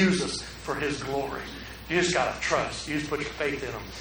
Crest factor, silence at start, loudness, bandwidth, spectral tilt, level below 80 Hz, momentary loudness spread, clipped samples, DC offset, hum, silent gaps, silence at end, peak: 18 dB; 0 s; -29 LUFS; over 20 kHz; -4 dB/octave; -48 dBFS; 10 LU; under 0.1%; under 0.1%; none; none; 0 s; -10 dBFS